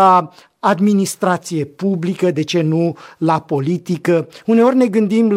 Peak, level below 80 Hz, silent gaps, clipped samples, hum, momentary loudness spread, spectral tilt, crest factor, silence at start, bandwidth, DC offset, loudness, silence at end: -2 dBFS; -64 dBFS; none; under 0.1%; none; 7 LU; -6.5 dB/octave; 14 dB; 0 s; 16 kHz; under 0.1%; -16 LUFS; 0 s